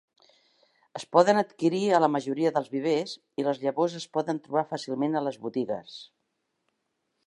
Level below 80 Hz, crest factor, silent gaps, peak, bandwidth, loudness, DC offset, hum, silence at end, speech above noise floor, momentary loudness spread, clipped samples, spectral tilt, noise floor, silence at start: -80 dBFS; 22 dB; none; -6 dBFS; 11.5 kHz; -27 LUFS; under 0.1%; none; 1.2 s; 52 dB; 12 LU; under 0.1%; -5.5 dB/octave; -79 dBFS; 0.95 s